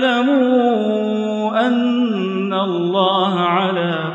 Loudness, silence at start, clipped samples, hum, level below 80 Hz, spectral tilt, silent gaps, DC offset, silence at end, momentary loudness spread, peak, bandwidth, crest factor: -17 LUFS; 0 s; under 0.1%; none; -70 dBFS; -7 dB/octave; none; under 0.1%; 0 s; 5 LU; -4 dBFS; 7.6 kHz; 12 dB